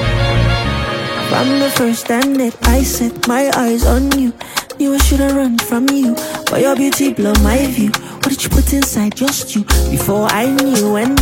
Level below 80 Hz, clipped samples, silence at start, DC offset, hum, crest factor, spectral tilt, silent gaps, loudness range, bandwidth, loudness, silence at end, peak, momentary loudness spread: -22 dBFS; under 0.1%; 0 s; under 0.1%; none; 14 dB; -4.5 dB/octave; none; 1 LU; 17 kHz; -14 LUFS; 0 s; 0 dBFS; 5 LU